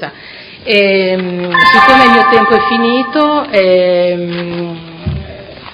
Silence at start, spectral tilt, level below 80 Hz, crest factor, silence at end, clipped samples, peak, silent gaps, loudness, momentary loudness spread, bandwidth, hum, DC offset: 0 s; -6 dB/octave; -38 dBFS; 10 dB; 0 s; 0.7%; 0 dBFS; none; -9 LUFS; 20 LU; 11.5 kHz; none; under 0.1%